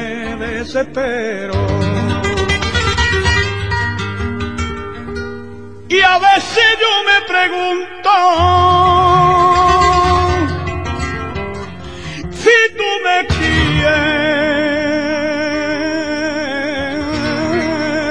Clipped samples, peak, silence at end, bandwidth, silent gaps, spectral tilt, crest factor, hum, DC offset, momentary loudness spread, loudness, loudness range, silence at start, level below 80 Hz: under 0.1%; 0 dBFS; 0 s; 10.5 kHz; none; -5 dB/octave; 14 dB; none; 1%; 13 LU; -14 LUFS; 6 LU; 0 s; -30 dBFS